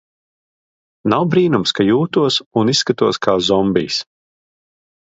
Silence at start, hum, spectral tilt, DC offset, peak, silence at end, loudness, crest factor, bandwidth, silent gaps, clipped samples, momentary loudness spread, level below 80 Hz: 1.05 s; none; -5 dB/octave; under 0.1%; 0 dBFS; 1 s; -16 LUFS; 18 dB; 8 kHz; 2.46-2.51 s; under 0.1%; 4 LU; -52 dBFS